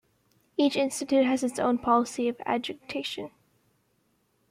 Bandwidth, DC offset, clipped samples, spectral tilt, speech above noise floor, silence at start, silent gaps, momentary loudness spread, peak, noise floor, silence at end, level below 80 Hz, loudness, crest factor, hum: 15.5 kHz; under 0.1%; under 0.1%; -3.5 dB/octave; 44 dB; 0.6 s; none; 11 LU; -12 dBFS; -71 dBFS; 1.2 s; -66 dBFS; -27 LUFS; 18 dB; none